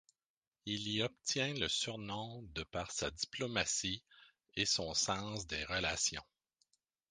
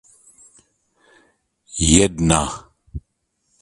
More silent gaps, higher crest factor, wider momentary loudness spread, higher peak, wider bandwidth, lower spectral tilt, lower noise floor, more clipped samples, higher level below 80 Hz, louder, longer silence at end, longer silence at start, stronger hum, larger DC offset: neither; about the same, 22 dB vs 22 dB; second, 11 LU vs 23 LU; second, -18 dBFS vs 0 dBFS; about the same, 10.5 kHz vs 11.5 kHz; second, -2 dB/octave vs -4 dB/octave; first, -80 dBFS vs -71 dBFS; neither; second, -60 dBFS vs -34 dBFS; second, -37 LUFS vs -17 LUFS; first, 0.9 s vs 0.6 s; second, 0.65 s vs 1.75 s; neither; neither